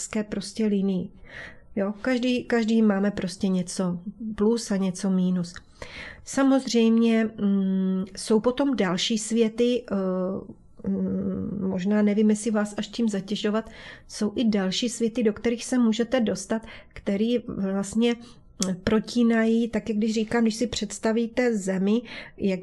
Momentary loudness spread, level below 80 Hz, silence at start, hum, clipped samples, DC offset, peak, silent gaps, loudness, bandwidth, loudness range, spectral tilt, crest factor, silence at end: 10 LU; -54 dBFS; 0 s; none; under 0.1%; under 0.1%; -6 dBFS; none; -25 LUFS; 12 kHz; 3 LU; -5.5 dB/octave; 18 dB; 0 s